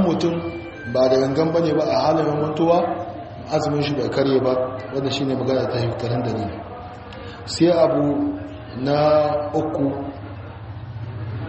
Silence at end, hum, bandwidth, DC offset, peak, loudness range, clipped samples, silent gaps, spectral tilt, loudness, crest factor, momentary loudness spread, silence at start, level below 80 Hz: 0 s; none; 8 kHz; under 0.1%; -4 dBFS; 3 LU; under 0.1%; none; -6 dB/octave; -21 LUFS; 16 dB; 17 LU; 0 s; -48 dBFS